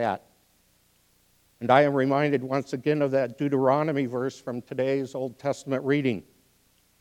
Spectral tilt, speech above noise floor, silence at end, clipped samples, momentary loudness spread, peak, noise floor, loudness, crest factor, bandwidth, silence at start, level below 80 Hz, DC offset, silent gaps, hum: -7 dB/octave; 40 dB; 0.8 s; under 0.1%; 12 LU; -4 dBFS; -65 dBFS; -26 LUFS; 22 dB; 15.5 kHz; 0 s; -72 dBFS; under 0.1%; none; 60 Hz at -60 dBFS